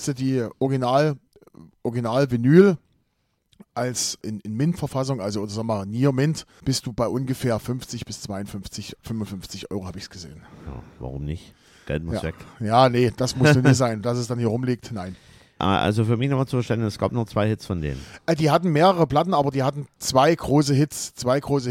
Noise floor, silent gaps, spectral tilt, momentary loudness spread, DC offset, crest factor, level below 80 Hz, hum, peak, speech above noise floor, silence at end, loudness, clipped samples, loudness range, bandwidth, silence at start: -71 dBFS; none; -6 dB/octave; 16 LU; under 0.1%; 20 dB; -48 dBFS; none; -2 dBFS; 49 dB; 0 s; -22 LUFS; under 0.1%; 12 LU; 16 kHz; 0 s